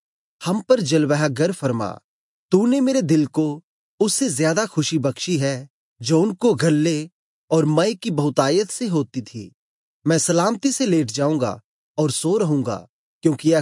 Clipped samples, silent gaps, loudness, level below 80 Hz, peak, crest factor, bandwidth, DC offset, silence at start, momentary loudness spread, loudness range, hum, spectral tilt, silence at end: under 0.1%; 2.04-2.49 s, 3.63-3.98 s, 5.70-5.96 s, 7.12-7.48 s, 9.54-10.02 s, 11.64-11.95 s, 12.89-13.21 s; -20 LUFS; -72 dBFS; -4 dBFS; 16 dB; 11.5 kHz; under 0.1%; 0.4 s; 11 LU; 2 LU; none; -5 dB/octave; 0 s